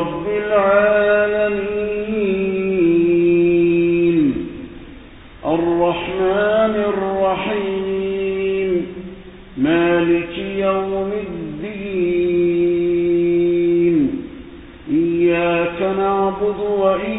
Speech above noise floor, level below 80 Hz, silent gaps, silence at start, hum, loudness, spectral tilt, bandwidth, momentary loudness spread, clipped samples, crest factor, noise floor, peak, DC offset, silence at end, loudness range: 24 dB; -44 dBFS; none; 0 s; none; -17 LUFS; -12 dB/octave; 4 kHz; 13 LU; under 0.1%; 14 dB; -39 dBFS; -2 dBFS; under 0.1%; 0 s; 3 LU